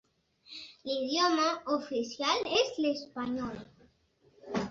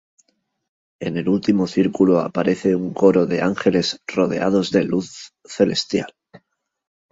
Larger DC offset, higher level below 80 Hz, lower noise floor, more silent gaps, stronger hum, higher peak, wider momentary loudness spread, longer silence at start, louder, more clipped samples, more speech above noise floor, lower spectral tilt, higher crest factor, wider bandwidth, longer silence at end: neither; second, -66 dBFS vs -56 dBFS; about the same, -68 dBFS vs -67 dBFS; neither; neither; second, -14 dBFS vs -2 dBFS; first, 17 LU vs 10 LU; second, 0.5 s vs 1 s; second, -31 LUFS vs -19 LUFS; neither; second, 36 dB vs 49 dB; second, -3.5 dB/octave vs -6 dB/octave; about the same, 20 dB vs 18 dB; about the same, 7.6 kHz vs 8 kHz; second, 0 s vs 0.75 s